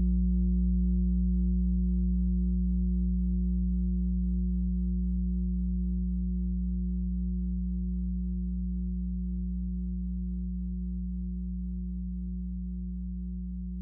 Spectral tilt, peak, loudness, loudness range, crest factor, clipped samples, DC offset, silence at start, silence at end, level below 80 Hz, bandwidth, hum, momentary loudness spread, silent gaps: -16 dB/octave; -18 dBFS; -32 LUFS; 7 LU; 10 dB; under 0.1%; under 0.1%; 0 s; 0 s; -32 dBFS; 0.6 kHz; none; 8 LU; none